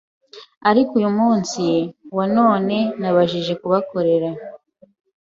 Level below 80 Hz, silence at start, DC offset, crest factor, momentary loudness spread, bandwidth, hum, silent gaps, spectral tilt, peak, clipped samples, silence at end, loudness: -62 dBFS; 0.35 s; under 0.1%; 16 dB; 8 LU; 7.8 kHz; none; 0.57-0.61 s; -6 dB/octave; -2 dBFS; under 0.1%; 0.65 s; -19 LUFS